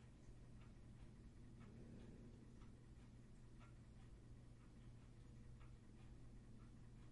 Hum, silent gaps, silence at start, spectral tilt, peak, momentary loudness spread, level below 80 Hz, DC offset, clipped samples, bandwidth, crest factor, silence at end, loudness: none; none; 0 s; -7 dB/octave; -48 dBFS; 3 LU; -66 dBFS; under 0.1%; under 0.1%; 11 kHz; 12 dB; 0 s; -64 LUFS